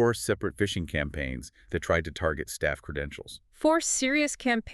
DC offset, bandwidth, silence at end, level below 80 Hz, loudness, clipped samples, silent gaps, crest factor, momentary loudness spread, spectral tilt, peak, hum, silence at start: under 0.1%; 13.5 kHz; 0 s; -44 dBFS; -28 LUFS; under 0.1%; none; 18 dB; 11 LU; -4 dB/octave; -10 dBFS; none; 0 s